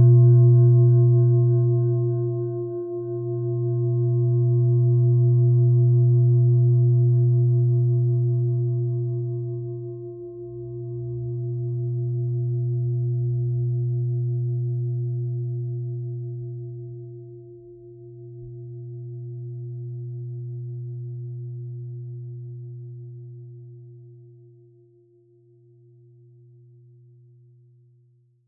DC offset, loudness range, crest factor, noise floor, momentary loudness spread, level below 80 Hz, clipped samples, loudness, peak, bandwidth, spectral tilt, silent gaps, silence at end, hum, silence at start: under 0.1%; 19 LU; 14 dB; -60 dBFS; 20 LU; -62 dBFS; under 0.1%; -22 LUFS; -8 dBFS; 1.1 kHz; -17.5 dB/octave; none; 4.35 s; none; 0 s